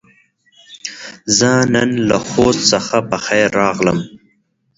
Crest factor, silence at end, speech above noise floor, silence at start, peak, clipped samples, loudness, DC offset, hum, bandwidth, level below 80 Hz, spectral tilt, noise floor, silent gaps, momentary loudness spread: 16 dB; 0.6 s; 47 dB; 0.7 s; 0 dBFS; under 0.1%; -14 LUFS; under 0.1%; none; 8 kHz; -46 dBFS; -3.5 dB/octave; -61 dBFS; none; 16 LU